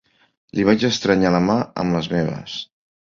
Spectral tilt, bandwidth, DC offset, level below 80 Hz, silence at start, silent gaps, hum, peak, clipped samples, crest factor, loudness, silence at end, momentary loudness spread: -6 dB/octave; 7.4 kHz; under 0.1%; -48 dBFS; 0.55 s; none; none; -2 dBFS; under 0.1%; 18 dB; -19 LUFS; 0.4 s; 13 LU